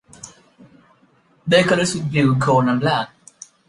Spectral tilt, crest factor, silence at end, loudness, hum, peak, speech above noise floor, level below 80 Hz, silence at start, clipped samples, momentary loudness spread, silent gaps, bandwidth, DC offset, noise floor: -5.5 dB/octave; 18 dB; 0.6 s; -17 LUFS; none; -2 dBFS; 40 dB; -56 dBFS; 0.25 s; under 0.1%; 23 LU; none; 11.5 kHz; under 0.1%; -57 dBFS